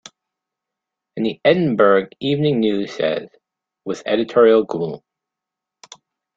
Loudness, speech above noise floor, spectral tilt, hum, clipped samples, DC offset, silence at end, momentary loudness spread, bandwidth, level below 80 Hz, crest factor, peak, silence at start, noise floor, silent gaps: -18 LUFS; 67 dB; -6.5 dB/octave; none; under 0.1%; under 0.1%; 1.4 s; 14 LU; 7.6 kHz; -62 dBFS; 18 dB; -2 dBFS; 1.15 s; -85 dBFS; none